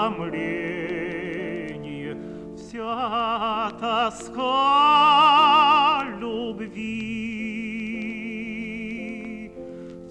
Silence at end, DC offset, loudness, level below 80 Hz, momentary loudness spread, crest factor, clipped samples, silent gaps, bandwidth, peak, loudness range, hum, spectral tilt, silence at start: 0 s; under 0.1%; -22 LUFS; -56 dBFS; 20 LU; 16 dB; under 0.1%; none; 10 kHz; -8 dBFS; 12 LU; none; -4.5 dB/octave; 0 s